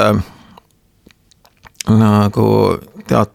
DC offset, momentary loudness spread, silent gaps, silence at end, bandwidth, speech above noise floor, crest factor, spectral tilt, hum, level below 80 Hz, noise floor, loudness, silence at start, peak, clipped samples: under 0.1%; 13 LU; none; 0.1 s; 15.5 kHz; 40 dB; 16 dB; -7 dB/octave; none; -44 dBFS; -52 dBFS; -14 LUFS; 0 s; 0 dBFS; under 0.1%